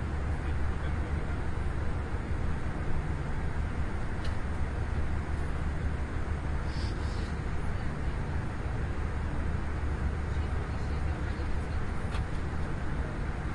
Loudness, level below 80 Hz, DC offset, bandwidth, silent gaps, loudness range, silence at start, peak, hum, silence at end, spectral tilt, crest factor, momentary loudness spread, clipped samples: -35 LUFS; -34 dBFS; under 0.1%; 10.5 kHz; none; 1 LU; 0 s; -18 dBFS; none; 0 s; -7 dB/octave; 12 dB; 2 LU; under 0.1%